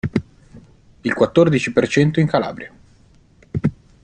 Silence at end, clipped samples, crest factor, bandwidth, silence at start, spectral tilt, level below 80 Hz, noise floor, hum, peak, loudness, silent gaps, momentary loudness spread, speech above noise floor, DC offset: 0.3 s; under 0.1%; 18 dB; 9.2 kHz; 0.05 s; -7 dB/octave; -48 dBFS; -51 dBFS; none; -2 dBFS; -18 LUFS; none; 14 LU; 35 dB; under 0.1%